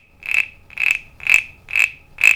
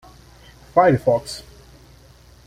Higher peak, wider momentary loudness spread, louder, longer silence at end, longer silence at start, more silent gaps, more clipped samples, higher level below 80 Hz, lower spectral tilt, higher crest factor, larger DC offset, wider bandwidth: about the same, 0 dBFS vs -2 dBFS; second, 5 LU vs 18 LU; about the same, -17 LUFS vs -18 LUFS; second, 0 s vs 1.05 s; second, 0.25 s vs 0.75 s; neither; neither; about the same, -50 dBFS vs -48 dBFS; second, 1 dB/octave vs -6.5 dB/octave; about the same, 20 dB vs 20 dB; neither; first, over 20 kHz vs 15.5 kHz